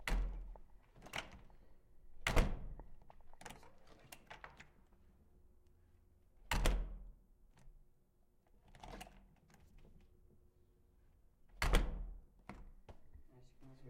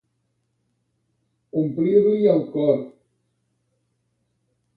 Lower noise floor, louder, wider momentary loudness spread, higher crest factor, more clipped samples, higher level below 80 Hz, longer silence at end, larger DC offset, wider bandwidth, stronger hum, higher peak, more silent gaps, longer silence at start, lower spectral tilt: about the same, -72 dBFS vs -72 dBFS; second, -43 LUFS vs -20 LUFS; first, 26 LU vs 10 LU; first, 26 dB vs 18 dB; neither; first, -46 dBFS vs -68 dBFS; second, 0 s vs 1.9 s; neither; first, 16 kHz vs 4.6 kHz; neither; second, -18 dBFS vs -6 dBFS; neither; second, 0 s vs 1.55 s; second, -4.5 dB/octave vs -11 dB/octave